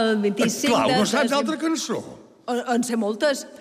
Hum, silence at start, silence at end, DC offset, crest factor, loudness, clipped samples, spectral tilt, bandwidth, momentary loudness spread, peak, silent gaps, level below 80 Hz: none; 0 s; 0.05 s; under 0.1%; 14 dB; -22 LUFS; under 0.1%; -3.5 dB/octave; 15.5 kHz; 10 LU; -8 dBFS; none; -66 dBFS